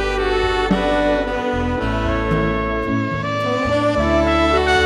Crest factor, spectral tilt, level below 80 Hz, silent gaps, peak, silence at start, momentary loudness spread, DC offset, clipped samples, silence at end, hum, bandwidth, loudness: 16 dB; -6 dB/octave; -28 dBFS; none; -2 dBFS; 0 s; 5 LU; under 0.1%; under 0.1%; 0 s; none; 12 kHz; -18 LUFS